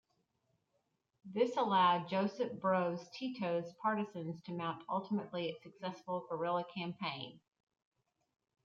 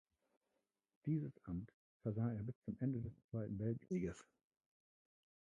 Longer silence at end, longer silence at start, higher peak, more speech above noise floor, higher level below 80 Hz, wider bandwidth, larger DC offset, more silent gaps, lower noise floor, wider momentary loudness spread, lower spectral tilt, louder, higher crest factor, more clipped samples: second, 1.25 s vs 1.4 s; first, 1.25 s vs 1.05 s; first, -20 dBFS vs -28 dBFS; about the same, 45 dB vs 45 dB; second, -86 dBFS vs -68 dBFS; second, 7.4 kHz vs 9 kHz; neither; second, none vs 1.74-2.00 s, 2.55-2.62 s, 3.24-3.29 s; second, -82 dBFS vs -89 dBFS; first, 13 LU vs 7 LU; second, -6.5 dB/octave vs -9.5 dB/octave; first, -37 LUFS vs -45 LUFS; about the same, 18 dB vs 18 dB; neither